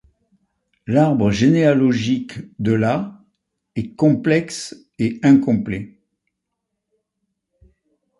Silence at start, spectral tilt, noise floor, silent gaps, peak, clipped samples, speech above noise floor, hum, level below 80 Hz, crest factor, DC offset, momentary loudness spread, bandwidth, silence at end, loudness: 0.9 s; -7 dB/octave; -78 dBFS; none; -4 dBFS; under 0.1%; 61 dB; none; -50 dBFS; 16 dB; under 0.1%; 16 LU; 11.5 kHz; 2.3 s; -18 LUFS